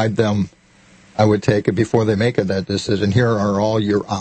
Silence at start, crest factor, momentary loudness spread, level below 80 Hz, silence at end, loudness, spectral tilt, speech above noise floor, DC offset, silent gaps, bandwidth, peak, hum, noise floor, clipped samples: 0 s; 16 dB; 5 LU; -48 dBFS; 0 s; -18 LUFS; -6.5 dB/octave; 33 dB; under 0.1%; none; 8.8 kHz; -2 dBFS; none; -50 dBFS; under 0.1%